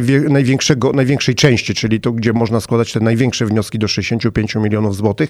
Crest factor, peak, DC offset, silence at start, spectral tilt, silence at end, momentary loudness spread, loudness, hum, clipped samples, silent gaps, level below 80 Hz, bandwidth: 14 dB; 0 dBFS; under 0.1%; 0 s; -5.5 dB/octave; 0 s; 4 LU; -15 LUFS; none; under 0.1%; none; -42 dBFS; 14 kHz